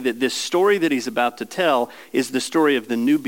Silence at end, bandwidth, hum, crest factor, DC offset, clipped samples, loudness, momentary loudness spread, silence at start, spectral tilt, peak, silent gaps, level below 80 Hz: 0 s; 17 kHz; none; 14 dB; 0.2%; under 0.1%; -20 LUFS; 5 LU; 0 s; -3.5 dB/octave; -6 dBFS; none; -78 dBFS